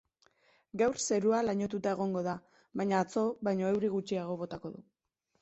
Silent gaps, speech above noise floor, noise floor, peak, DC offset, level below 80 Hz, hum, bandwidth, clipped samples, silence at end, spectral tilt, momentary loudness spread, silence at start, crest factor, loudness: none; 37 dB; -69 dBFS; -16 dBFS; under 0.1%; -70 dBFS; none; 8.2 kHz; under 0.1%; 0.6 s; -5.5 dB/octave; 14 LU; 0.75 s; 18 dB; -32 LUFS